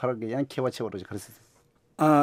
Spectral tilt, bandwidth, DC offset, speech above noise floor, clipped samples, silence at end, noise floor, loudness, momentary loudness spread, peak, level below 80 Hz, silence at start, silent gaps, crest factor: -7 dB/octave; 16 kHz; under 0.1%; 16 dB; under 0.1%; 0 s; -47 dBFS; -29 LUFS; 19 LU; -8 dBFS; -70 dBFS; 0 s; none; 20 dB